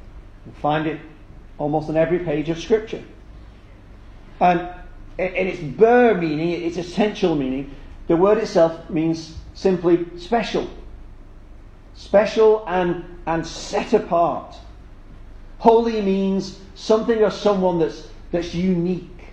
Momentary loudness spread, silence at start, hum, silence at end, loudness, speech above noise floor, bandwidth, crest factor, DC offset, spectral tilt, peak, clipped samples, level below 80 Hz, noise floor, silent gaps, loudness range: 13 LU; 0.05 s; none; 0 s; -20 LUFS; 23 dB; 8.8 kHz; 20 dB; under 0.1%; -6.5 dB/octave; 0 dBFS; under 0.1%; -42 dBFS; -43 dBFS; none; 5 LU